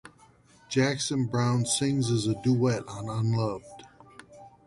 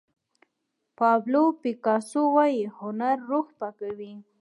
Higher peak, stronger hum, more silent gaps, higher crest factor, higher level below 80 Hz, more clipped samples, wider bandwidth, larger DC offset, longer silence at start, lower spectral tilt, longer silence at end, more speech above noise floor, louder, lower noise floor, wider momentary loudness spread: second, -12 dBFS vs -8 dBFS; neither; neither; about the same, 16 dB vs 18 dB; first, -60 dBFS vs -80 dBFS; neither; about the same, 11.5 kHz vs 11.5 kHz; neither; second, 0.05 s vs 1 s; about the same, -5 dB/octave vs -6 dB/octave; about the same, 0.2 s vs 0.2 s; second, 32 dB vs 55 dB; about the same, -27 LUFS vs -25 LUFS; second, -58 dBFS vs -80 dBFS; second, 7 LU vs 14 LU